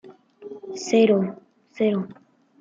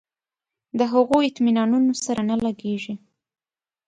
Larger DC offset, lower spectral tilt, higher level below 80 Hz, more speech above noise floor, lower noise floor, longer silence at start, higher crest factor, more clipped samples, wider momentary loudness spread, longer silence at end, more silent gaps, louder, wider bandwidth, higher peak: neither; about the same, -6 dB/octave vs -5 dB/octave; second, -74 dBFS vs -60 dBFS; second, 22 dB vs 69 dB; second, -43 dBFS vs -90 dBFS; second, 0.05 s vs 0.75 s; about the same, 18 dB vs 16 dB; neither; first, 20 LU vs 12 LU; second, 0.5 s vs 0.9 s; neither; about the same, -22 LUFS vs -21 LUFS; second, 7.8 kHz vs 9.6 kHz; about the same, -6 dBFS vs -6 dBFS